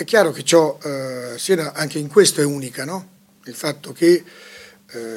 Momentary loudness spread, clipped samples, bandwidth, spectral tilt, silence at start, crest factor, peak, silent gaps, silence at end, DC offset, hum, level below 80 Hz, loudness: 17 LU; under 0.1%; 16.5 kHz; -4 dB/octave; 0 s; 20 dB; 0 dBFS; none; 0 s; under 0.1%; none; -72 dBFS; -19 LUFS